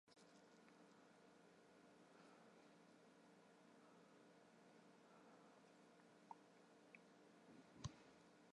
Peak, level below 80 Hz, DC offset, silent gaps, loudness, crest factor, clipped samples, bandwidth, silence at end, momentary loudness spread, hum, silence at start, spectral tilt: -34 dBFS; -84 dBFS; under 0.1%; none; -66 LUFS; 32 dB; under 0.1%; 11 kHz; 0 s; 11 LU; none; 0.05 s; -5 dB/octave